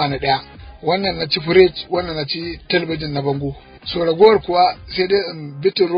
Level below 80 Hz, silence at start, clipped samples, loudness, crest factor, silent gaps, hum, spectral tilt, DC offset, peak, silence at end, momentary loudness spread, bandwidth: -42 dBFS; 0 s; under 0.1%; -18 LUFS; 18 dB; none; none; -8.5 dB/octave; under 0.1%; 0 dBFS; 0 s; 12 LU; 5.2 kHz